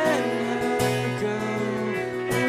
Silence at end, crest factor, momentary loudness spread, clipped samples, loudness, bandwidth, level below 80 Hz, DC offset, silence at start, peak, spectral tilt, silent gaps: 0 s; 16 dB; 4 LU; under 0.1%; -25 LUFS; 15.5 kHz; -56 dBFS; under 0.1%; 0 s; -10 dBFS; -5.5 dB/octave; none